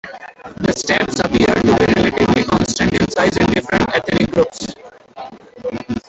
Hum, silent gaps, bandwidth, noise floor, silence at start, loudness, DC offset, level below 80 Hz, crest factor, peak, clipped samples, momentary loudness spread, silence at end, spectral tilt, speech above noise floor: none; none; 8.4 kHz; -37 dBFS; 0.05 s; -15 LUFS; under 0.1%; -38 dBFS; 16 dB; -2 dBFS; under 0.1%; 20 LU; 0.1 s; -5 dB/octave; 23 dB